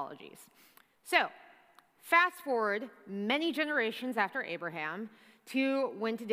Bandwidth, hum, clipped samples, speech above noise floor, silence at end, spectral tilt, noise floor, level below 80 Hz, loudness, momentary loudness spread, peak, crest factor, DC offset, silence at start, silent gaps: 15.5 kHz; none; under 0.1%; 30 dB; 0 s; -4 dB/octave; -63 dBFS; under -90 dBFS; -32 LUFS; 16 LU; -10 dBFS; 24 dB; under 0.1%; 0 s; none